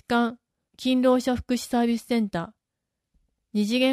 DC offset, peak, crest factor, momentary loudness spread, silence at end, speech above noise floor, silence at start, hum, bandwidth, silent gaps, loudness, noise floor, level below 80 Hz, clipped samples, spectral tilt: under 0.1%; -10 dBFS; 16 dB; 10 LU; 0 s; 60 dB; 0.1 s; none; 15 kHz; none; -25 LUFS; -84 dBFS; -54 dBFS; under 0.1%; -5 dB/octave